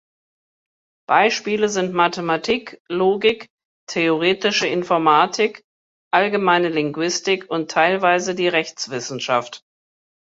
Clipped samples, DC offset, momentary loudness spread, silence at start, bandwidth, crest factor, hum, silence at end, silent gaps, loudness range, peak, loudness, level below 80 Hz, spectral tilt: under 0.1%; under 0.1%; 9 LU; 1.1 s; 8 kHz; 18 dB; none; 0.7 s; 2.80-2.85 s, 3.50-3.58 s, 3.65-3.87 s, 5.64-6.11 s; 2 LU; -2 dBFS; -19 LUFS; -64 dBFS; -3.5 dB/octave